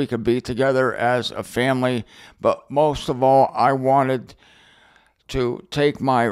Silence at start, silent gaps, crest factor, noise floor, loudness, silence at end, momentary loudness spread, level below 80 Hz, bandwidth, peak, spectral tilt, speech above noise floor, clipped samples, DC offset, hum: 0 s; none; 16 dB; -56 dBFS; -20 LUFS; 0 s; 8 LU; -46 dBFS; 15 kHz; -4 dBFS; -6 dB/octave; 36 dB; under 0.1%; under 0.1%; none